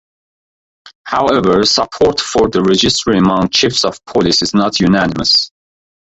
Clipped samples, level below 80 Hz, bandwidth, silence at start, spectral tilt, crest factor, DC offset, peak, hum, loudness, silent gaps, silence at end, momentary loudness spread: under 0.1%; -40 dBFS; 8.2 kHz; 0.85 s; -4 dB/octave; 14 dB; under 0.1%; 0 dBFS; none; -12 LUFS; 0.95-1.05 s; 0.65 s; 5 LU